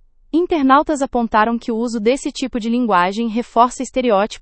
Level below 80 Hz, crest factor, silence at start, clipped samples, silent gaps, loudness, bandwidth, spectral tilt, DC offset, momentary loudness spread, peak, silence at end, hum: -44 dBFS; 16 dB; 0.35 s; under 0.1%; none; -17 LUFS; 8.8 kHz; -4.5 dB/octave; under 0.1%; 8 LU; 0 dBFS; 0 s; none